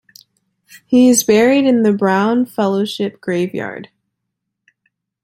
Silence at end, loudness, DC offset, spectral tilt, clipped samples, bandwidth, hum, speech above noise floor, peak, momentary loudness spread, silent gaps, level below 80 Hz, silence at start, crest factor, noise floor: 1.4 s; -14 LUFS; under 0.1%; -4.5 dB/octave; under 0.1%; 16.5 kHz; none; 63 dB; -2 dBFS; 11 LU; none; -62 dBFS; 0.9 s; 14 dB; -77 dBFS